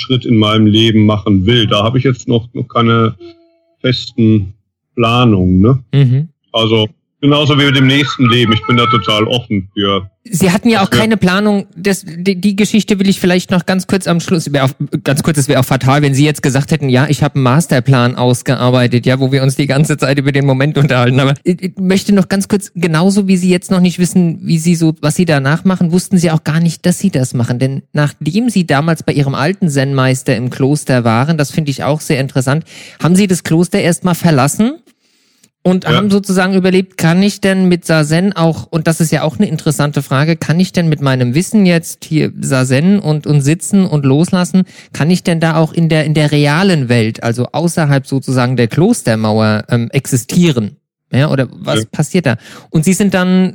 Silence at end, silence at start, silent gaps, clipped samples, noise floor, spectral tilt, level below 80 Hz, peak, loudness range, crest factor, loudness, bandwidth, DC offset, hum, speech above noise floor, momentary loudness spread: 0 s; 0 s; none; under 0.1%; -55 dBFS; -6 dB/octave; -44 dBFS; 0 dBFS; 2 LU; 12 dB; -12 LUFS; 18.5 kHz; under 0.1%; none; 44 dB; 6 LU